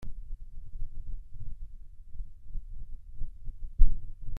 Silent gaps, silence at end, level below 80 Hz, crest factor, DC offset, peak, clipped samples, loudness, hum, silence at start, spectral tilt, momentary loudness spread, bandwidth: none; 0 s; -32 dBFS; 22 dB; under 0.1%; -6 dBFS; under 0.1%; -41 LUFS; none; 0 s; -9 dB/octave; 18 LU; 0.4 kHz